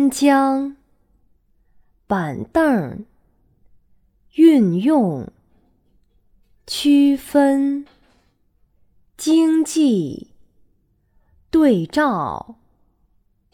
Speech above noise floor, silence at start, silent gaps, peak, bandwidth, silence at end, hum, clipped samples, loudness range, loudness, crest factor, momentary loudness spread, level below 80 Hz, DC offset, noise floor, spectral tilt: 45 dB; 0 s; none; -2 dBFS; 15.5 kHz; 1 s; none; under 0.1%; 4 LU; -17 LUFS; 18 dB; 16 LU; -54 dBFS; under 0.1%; -62 dBFS; -5.5 dB/octave